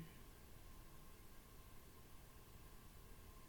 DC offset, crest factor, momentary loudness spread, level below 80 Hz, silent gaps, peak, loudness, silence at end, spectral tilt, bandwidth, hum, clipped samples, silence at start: under 0.1%; 16 dB; 1 LU; -64 dBFS; none; -44 dBFS; -63 LUFS; 0 s; -4.5 dB/octave; 19 kHz; none; under 0.1%; 0 s